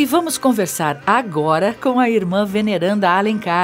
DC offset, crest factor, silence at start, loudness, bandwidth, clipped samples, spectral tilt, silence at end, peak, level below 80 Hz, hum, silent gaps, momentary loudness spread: under 0.1%; 16 dB; 0 s; -17 LUFS; 16 kHz; under 0.1%; -5 dB/octave; 0 s; -2 dBFS; -58 dBFS; none; none; 3 LU